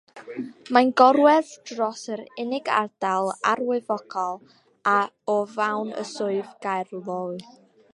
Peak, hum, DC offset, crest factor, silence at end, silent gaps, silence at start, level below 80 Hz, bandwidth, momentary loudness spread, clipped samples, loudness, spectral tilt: 0 dBFS; none; under 0.1%; 24 dB; 0.55 s; none; 0.15 s; -80 dBFS; 11.5 kHz; 17 LU; under 0.1%; -24 LUFS; -4.5 dB/octave